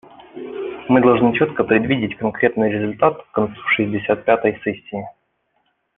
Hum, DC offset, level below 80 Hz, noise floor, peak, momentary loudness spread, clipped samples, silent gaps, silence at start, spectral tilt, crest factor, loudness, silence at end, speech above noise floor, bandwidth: none; under 0.1%; -54 dBFS; -67 dBFS; -2 dBFS; 14 LU; under 0.1%; none; 0.2 s; -9.5 dB/octave; 18 dB; -18 LUFS; 0.85 s; 50 dB; 3.9 kHz